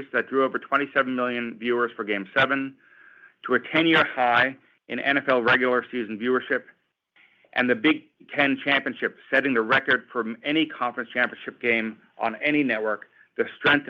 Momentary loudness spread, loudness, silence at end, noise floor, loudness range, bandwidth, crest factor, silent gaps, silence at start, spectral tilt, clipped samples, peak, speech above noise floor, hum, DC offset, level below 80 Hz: 10 LU; -24 LUFS; 0.05 s; -62 dBFS; 3 LU; 7.2 kHz; 18 dB; none; 0 s; -6.5 dB/octave; under 0.1%; -6 dBFS; 38 dB; none; under 0.1%; -68 dBFS